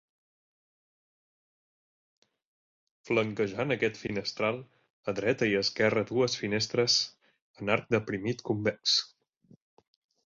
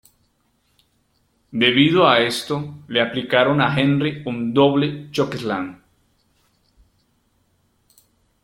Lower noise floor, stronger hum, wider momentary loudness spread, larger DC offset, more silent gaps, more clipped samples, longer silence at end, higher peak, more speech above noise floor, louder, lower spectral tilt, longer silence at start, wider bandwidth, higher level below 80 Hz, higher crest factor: first, under -90 dBFS vs -65 dBFS; neither; second, 9 LU vs 12 LU; neither; first, 4.90-5.03 s, 7.42-7.54 s vs none; neither; second, 1.2 s vs 2.7 s; second, -10 dBFS vs 0 dBFS; first, over 61 dB vs 47 dB; second, -29 LUFS vs -19 LUFS; second, -4 dB/octave vs -5.5 dB/octave; first, 3.05 s vs 1.55 s; second, 7.8 kHz vs 15 kHz; second, -66 dBFS vs -58 dBFS; about the same, 22 dB vs 20 dB